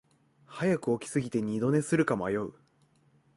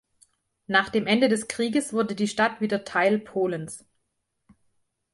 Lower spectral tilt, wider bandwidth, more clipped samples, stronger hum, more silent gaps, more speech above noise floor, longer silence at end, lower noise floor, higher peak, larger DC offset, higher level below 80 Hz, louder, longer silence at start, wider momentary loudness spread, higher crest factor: first, -6.5 dB/octave vs -4.5 dB/octave; about the same, 11.5 kHz vs 11.5 kHz; neither; neither; neither; second, 38 dB vs 53 dB; second, 0.85 s vs 1.35 s; second, -66 dBFS vs -77 dBFS; second, -14 dBFS vs -6 dBFS; neither; about the same, -64 dBFS vs -66 dBFS; second, -30 LUFS vs -24 LUFS; second, 0.5 s vs 0.7 s; about the same, 7 LU vs 7 LU; about the same, 18 dB vs 20 dB